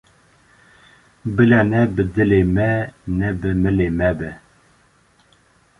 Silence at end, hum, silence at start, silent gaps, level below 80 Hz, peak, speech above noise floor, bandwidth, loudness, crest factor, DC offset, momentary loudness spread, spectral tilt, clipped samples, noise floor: 1.4 s; none; 1.25 s; none; -36 dBFS; -2 dBFS; 39 dB; 11 kHz; -18 LUFS; 18 dB; under 0.1%; 11 LU; -9 dB/octave; under 0.1%; -56 dBFS